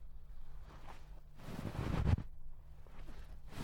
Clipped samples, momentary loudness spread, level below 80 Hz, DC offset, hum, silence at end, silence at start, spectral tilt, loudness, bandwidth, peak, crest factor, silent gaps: under 0.1%; 22 LU; -48 dBFS; under 0.1%; none; 0 s; 0 s; -7.5 dB/octave; -40 LUFS; 16.5 kHz; -20 dBFS; 22 dB; none